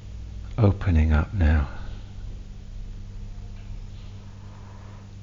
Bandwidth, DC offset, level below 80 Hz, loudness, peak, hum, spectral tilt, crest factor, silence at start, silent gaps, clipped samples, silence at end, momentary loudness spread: 7 kHz; under 0.1%; -30 dBFS; -23 LUFS; -8 dBFS; 50 Hz at -40 dBFS; -8.5 dB/octave; 18 dB; 0 s; none; under 0.1%; 0 s; 21 LU